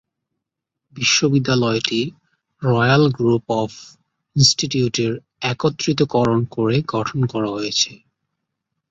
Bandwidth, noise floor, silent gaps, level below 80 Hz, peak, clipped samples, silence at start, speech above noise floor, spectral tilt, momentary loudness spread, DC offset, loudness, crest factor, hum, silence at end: 8.2 kHz; -82 dBFS; none; -52 dBFS; 0 dBFS; under 0.1%; 0.95 s; 63 dB; -4.5 dB/octave; 9 LU; under 0.1%; -19 LUFS; 20 dB; none; 0.95 s